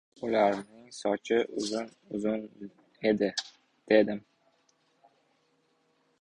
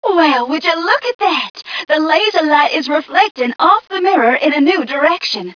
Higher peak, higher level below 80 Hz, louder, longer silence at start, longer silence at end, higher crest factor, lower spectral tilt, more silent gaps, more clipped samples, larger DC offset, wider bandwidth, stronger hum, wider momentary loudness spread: second, -8 dBFS vs 0 dBFS; second, -70 dBFS vs -62 dBFS; second, -30 LUFS vs -13 LUFS; first, 0.2 s vs 0 s; first, 2 s vs 0.05 s; first, 22 dB vs 14 dB; first, -4.5 dB/octave vs -3 dB/octave; second, none vs 1.15-1.19 s, 1.50-1.54 s, 3.31-3.35 s; neither; neither; first, 11 kHz vs 5.4 kHz; neither; first, 20 LU vs 4 LU